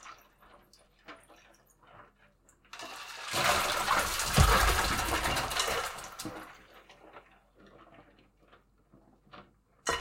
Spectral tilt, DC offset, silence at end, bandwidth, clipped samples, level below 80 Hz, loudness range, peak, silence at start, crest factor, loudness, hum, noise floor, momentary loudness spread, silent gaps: -3 dB/octave; under 0.1%; 0 s; 16.5 kHz; under 0.1%; -42 dBFS; 20 LU; -10 dBFS; 0 s; 24 dB; -29 LUFS; none; -65 dBFS; 26 LU; none